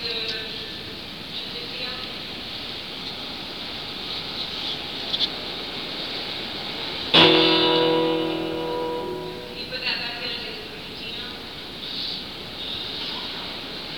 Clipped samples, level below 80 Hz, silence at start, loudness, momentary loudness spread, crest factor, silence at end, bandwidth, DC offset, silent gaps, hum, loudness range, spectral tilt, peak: under 0.1%; -54 dBFS; 0 s; -25 LUFS; 14 LU; 24 dB; 0 s; 19.5 kHz; 0.3%; none; none; 10 LU; -4.5 dB/octave; -2 dBFS